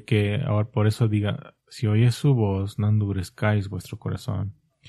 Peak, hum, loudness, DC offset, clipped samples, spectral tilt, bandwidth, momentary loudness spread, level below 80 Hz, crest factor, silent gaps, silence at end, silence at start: -6 dBFS; none; -24 LUFS; under 0.1%; under 0.1%; -7.5 dB/octave; 12.5 kHz; 12 LU; -56 dBFS; 16 dB; none; 0 s; 0.1 s